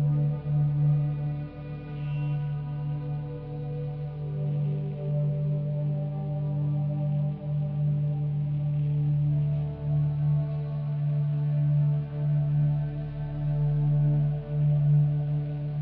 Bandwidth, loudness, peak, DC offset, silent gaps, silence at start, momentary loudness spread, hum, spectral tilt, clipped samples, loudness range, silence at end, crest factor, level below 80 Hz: 3.3 kHz; -28 LUFS; -16 dBFS; under 0.1%; none; 0 s; 9 LU; none; -11 dB/octave; under 0.1%; 5 LU; 0 s; 12 dB; -48 dBFS